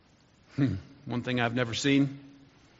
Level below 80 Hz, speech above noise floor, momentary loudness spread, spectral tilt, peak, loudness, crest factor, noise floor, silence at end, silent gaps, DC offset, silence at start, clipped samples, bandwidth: -64 dBFS; 33 dB; 14 LU; -5 dB/octave; -10 dBFS; -29 LUFS; 20 dB; -61 dBFS; 0.5 s; none; under 0.1%; 0.55 s; under 0.1%; 7.6 kHz